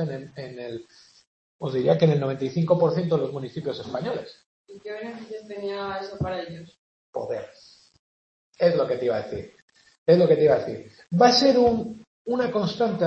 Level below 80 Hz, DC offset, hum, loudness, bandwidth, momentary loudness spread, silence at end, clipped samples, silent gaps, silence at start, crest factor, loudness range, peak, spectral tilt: -58 dBFS; under 0.1%; none; -23 LUFS; 8.2 kHz; 19 LU; 0 s; under 0.1%; 1.27-1.59 s, 4.46-4.65 s, 6.78-7.13 s, 7.99-8.53 s, 9.62-9.68 s, 9.98-10.06 s, 12.07-12.25 s; 0 s; 20 dB; 12 LU; -4 dBFS; -6.5 dB/octave